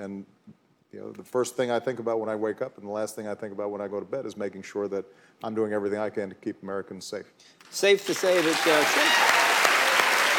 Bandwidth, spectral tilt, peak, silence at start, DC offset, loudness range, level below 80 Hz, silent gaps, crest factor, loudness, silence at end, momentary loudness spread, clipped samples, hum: 19 kHz; -2 dB/octave; -4 dBFS; 0 s; under 0.1%; 11 LU; -80 dBFS; none; 24 dB; -25 LUFS; 0 s; 17 LU; under 0.1%; none